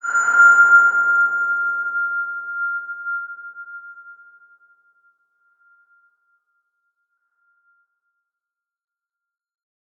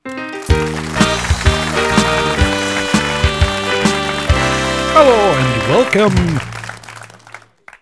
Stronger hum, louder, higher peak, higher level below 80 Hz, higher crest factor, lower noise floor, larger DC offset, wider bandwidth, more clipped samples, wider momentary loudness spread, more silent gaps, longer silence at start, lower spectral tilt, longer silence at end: neither; about the same, -16 LUFS vs -14 LUFS; about the same, -2 dBFS vs 0 dBFS; second, -88 dBFS vs -24 dBFS; about the same, 18 dB vs 14 dB; first, -86 dBFS vs -39 dBFS; neither; second, 7.4 kHz vs 11 kHz; neither; first, 24 LU vs 14 LU; neither; about the same, 0.05 s vs 0.05 s; second, 0 dB/octave vs -4.5 dB/octave; first, 5.85 s vs 0.05 s